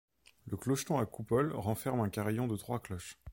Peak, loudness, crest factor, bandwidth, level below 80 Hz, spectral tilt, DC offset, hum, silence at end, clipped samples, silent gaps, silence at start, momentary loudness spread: -18 dBFS; -35 LUFS; 16 dB; 17 kHz; -62 dBFS; -6 dB/octave; under 0.1%; none; 0 s; under 0.1%; none; 0.45 s; 12 LU